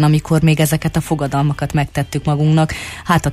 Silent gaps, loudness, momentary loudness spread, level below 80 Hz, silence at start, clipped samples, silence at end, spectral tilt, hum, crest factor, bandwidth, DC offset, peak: none; -16 LUFS; 6 LU; -36 dBFS; 0 s; under 0.1%; 0 s; -6 dB/octave; none; 14 dB; 15 kHz; under 0.1%; -2 dBFS